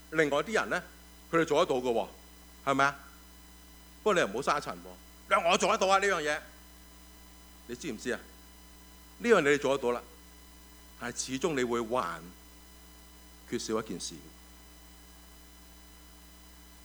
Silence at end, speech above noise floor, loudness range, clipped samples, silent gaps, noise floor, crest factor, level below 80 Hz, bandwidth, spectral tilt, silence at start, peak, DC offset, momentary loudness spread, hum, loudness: 0.1 s; 24 dB; 12 LU; under 0.1%; none; -53 dBFS; 22 dB; -56 dBFS; over 20 kHz; -3.5 dB/octave; 0 s; -10 dBFS; under 0.1%; 26 LU; none; -30 LUFS